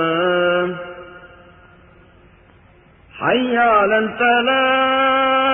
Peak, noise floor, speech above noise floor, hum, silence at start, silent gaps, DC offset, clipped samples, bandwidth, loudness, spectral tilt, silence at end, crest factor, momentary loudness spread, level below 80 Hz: -4 dBFS; -49 dBFS; 34 dB; none; 0 s; none; under 0.1%; under 0.1%; 3.6 kHz; -16 LUFS; -9.5 dB/octave; 0 s; 16 dB; 10 LU; -54 dBFS